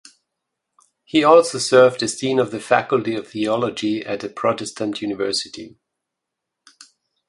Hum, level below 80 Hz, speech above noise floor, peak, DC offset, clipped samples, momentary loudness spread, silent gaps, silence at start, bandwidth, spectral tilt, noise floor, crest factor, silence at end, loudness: none; -64 dBFS; 63 dB; 0 dBFS; under 0.1%; under 0.1%; 12 LU; none; 1.15 s; 11.5 kHz; -4 dB/octave; -82 dBFS; 20 dB; 1.6 s; -19 LUFS